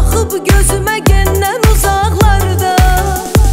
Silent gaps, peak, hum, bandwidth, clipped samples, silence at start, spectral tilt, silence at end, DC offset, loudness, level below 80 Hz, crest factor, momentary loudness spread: none; 0 dBFS; none; 16.5 kHz; under 0.1%; 0 s; -5 dB/octave; 0 s; 0.3%; -11 LUFS; -14 dBFS; 10 dB; 3 LU